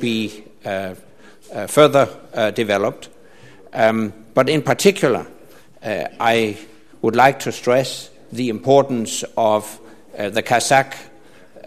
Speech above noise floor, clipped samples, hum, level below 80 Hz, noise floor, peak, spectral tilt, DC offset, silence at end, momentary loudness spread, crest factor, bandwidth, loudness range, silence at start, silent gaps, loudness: 28 dB; under 0.1%; none; -60 dBFS; -46 dBFS; 0 dBFS; -4.5 dB/octave; 0.5%; 0.1 s; 17 LU; 20 dB; 14 kHz; 2 LU; 0 s; none; -18 LUFS